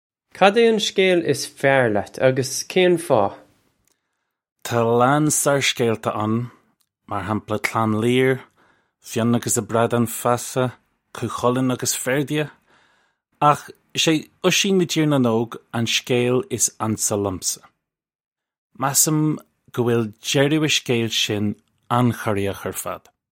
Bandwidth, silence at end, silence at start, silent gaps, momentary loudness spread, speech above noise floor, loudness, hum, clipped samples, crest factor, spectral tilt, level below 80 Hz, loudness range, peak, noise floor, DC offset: 16.5 kHz; 0.4 s; 0.35 s; 4.52-4.56 s, 18.15-18.19 s, 18.26-18.36 s, 18.58-18.70 s; 11 LU; 57 dB; -20 LUFS; none; under 0.1%; 20 dB; -4 dB/octave; -60 dBFS; 3 LU; -2 dBFS; -77 dBFS; under 0.1%